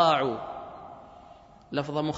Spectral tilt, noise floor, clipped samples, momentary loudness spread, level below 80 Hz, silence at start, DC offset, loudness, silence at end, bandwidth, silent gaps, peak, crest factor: -6 dB/octave; -52 dBFS; under 0.1%; 24 LU; -62 dBFS; 0 s; under 0.1%; -30 LUFS; 0 s; 8 kHz; none; -8 dBFS; 22 dB